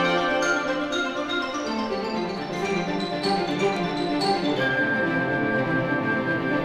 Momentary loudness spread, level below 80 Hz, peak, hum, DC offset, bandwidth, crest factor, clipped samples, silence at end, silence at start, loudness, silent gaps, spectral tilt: 5 LU; -54 dBFS; -10 dBFS; none; under 0.1%; 13 kHz; 14 dB; under 0.1%; 0 s; 0 s; -24 LUFS; none; -5 dB/octave